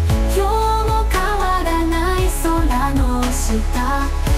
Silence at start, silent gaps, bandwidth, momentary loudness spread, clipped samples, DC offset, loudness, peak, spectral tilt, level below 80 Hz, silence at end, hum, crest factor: 0 s; none; 16 kHz; 3 LU; under 0.1%; under 0.1%; -18 LUFS; -6 dBFS; -5.5 dB/octave; -20 dBFS; 0 s; none; 12 dB